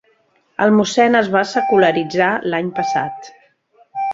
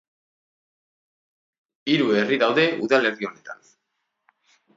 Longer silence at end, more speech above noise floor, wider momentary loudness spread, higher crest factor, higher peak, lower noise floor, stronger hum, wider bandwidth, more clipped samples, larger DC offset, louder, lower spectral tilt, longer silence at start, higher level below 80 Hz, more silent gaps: second, 0 s vs 1.2 s; second, 43 dB vs 56 dB; about the same, 13 LU vs 15 LU; second, 16 dB vs 22 dB; about the same, -2 dBFS vs -2 dBFS; second, -59 dBFS vs -77 dBFS; neither; about the same, 8 kHz vs 7.8 kHz; neither; neither; first, -16 LUFS vs -21 LUFS; about the same, -5 dB/octave vs -5.5 dB/octave; second, 0.6 s vs 1.85 s; first, -60 dBFS vs -76 dBFS; neither